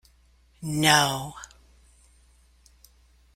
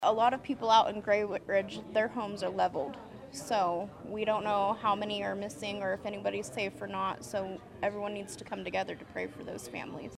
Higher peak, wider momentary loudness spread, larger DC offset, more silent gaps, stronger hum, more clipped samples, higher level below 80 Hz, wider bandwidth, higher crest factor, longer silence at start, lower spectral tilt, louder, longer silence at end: first, -4 dBFS vs -12 dBFS; first, 25 LU vs 12 LU; neither; neither; neither; neither; first, -56 dBFS vs -66 dBFS; first, 16 kHz vs 14.5 kHz; about the same, 24 dB vs 20 dB; first, 0.6 s vs 0 s; second, -3 dB/octave vs -4.5 dB/octave; first, -22 LUFS vs -33 LUFS; first, 1.9 s vs 0 s